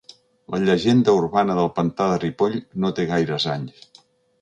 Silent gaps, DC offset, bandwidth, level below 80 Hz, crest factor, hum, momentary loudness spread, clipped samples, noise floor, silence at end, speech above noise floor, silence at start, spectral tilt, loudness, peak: none; under 0.1%; 9.4 kHz; -54 dBFS; 16 dB; none; 8 LU; under 0.1%; -55 dBFS; 0.7 s; 35 dB; 0.5 s; -6.5 dB/octave; -21 LUFS; -4 dBFS